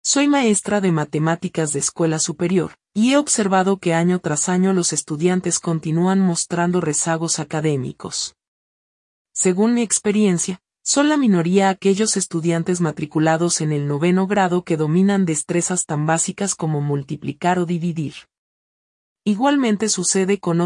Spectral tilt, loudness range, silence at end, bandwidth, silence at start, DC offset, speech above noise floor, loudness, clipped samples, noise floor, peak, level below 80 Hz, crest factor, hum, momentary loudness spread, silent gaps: -4.5 dB/octave; 4 LU; 0 s; 11 kHz; 0.05 s; under 0.1%; over 71 dB; -19 LUFS; under 0.1%; under -90 dBFS; -4 dBFS; -62 dBFS; 16 dB; none; 6 LU; 8.48-9.25 s, 18.38-19.16 s